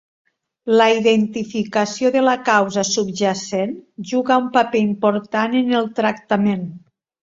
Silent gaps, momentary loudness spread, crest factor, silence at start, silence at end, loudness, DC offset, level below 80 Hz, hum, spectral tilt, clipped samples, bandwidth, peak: none; 8 LU; 18 dB; 0.65 s; 0.45 s; -18 LUFS; under 0.1%; -62 dBFS; none; -4.5 dB/octave; under 0.1%; 7.8 kHz; -2 dBFS